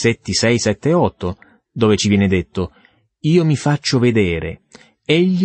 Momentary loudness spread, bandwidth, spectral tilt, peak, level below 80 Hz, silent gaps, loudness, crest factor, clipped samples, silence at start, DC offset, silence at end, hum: 13 LU; 8.8 kHz; -5.5 dB/octave; -2 dBFS; -44 dBFS; none; -17 LUFS; 14 dB; under 0.1%; 0 s; under 0.1%; 0 s; none